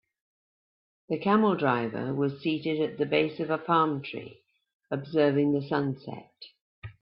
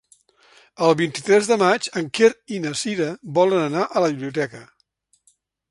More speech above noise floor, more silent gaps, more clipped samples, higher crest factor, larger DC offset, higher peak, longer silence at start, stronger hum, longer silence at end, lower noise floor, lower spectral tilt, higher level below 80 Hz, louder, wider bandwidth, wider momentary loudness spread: first, over 63 dB vs 45 dB; first, 4.74-4.80 s, 6.61-6.82 s vs none; neither; about the same, 18 dB vs 20 dB; neither; second, -10 dBFS vs -2 dBFS; first, 1.1 s vs 0.8 s; neither; second, 0.1 s vs 1.1 s; first, under -90 dBFS vs -65 dBFS; first, -10.5 dB/octave vs -4.5 dB/octave; about the same, -70 dBFS vs -68 dBFS; second, -27 LUFS vs -20 LUFS; second, 5.6 kHz vs 11.5 kHz; first, 17 LU vs 8 LU